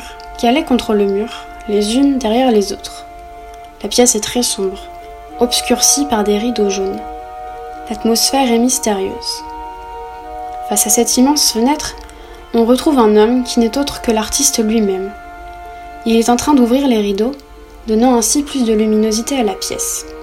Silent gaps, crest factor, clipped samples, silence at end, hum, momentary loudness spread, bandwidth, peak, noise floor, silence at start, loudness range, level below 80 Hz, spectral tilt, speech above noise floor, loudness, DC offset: none; 14 dB; under 0.1%; 0 s; none; 19 LU; 16.5 kHz; 0 dBFS; -34 dBFS; 0 s; 3 LU; -38 dBFS; -3 dB/octave; 20 dB; -14 LUFS; under 0.1%